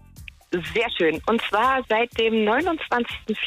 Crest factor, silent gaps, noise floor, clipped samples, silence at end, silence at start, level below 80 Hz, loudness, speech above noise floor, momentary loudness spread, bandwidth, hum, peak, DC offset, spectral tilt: 14 dB; none; -44 dBFS; under 0.1%; 0 s; 0.15 s; -50 dBFS; -22 LUFS; 22 dB; 6 LU; 15.5 kHz; none; -10 dBFS; under 0.1%; -5 dB/octave